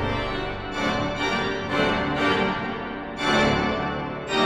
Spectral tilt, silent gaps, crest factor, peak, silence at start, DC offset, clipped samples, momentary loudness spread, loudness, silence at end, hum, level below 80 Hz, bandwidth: -5 dB/octave; none; 16 dB; -8 dBFS; 0 s; under 0.1%; under 0.1%; 9 LU; -24 LUFS; 0 s; none; -40 dBFS; 13.5 kHz